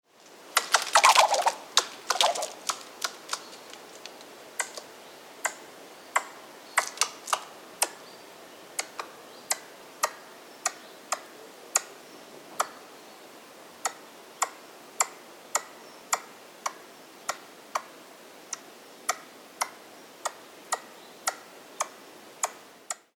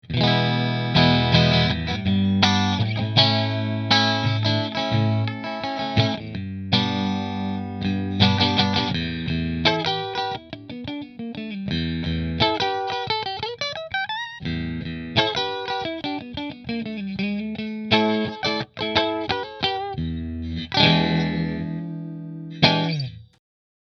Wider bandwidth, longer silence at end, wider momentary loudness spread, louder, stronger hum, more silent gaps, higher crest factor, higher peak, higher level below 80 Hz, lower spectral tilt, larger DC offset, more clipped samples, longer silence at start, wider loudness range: first, over 20 kHz vs 6.8 kHz; second, 0.25 s vs 0.6 s; first, 23 LU vs 13 LU; second, -29 LUFS vs -22 LUFS; neither; neither; first, 30 dB vs 22 dB; about the same, -2 dBFS vs 0 dBFS; second, -88 dBFS vs -44 dBFS; second, 1.5 dB/octave vs -6 dB/octave; neither; neither; first, 0.45 s vs 0.05 s; first, 12 LU vs 6 LU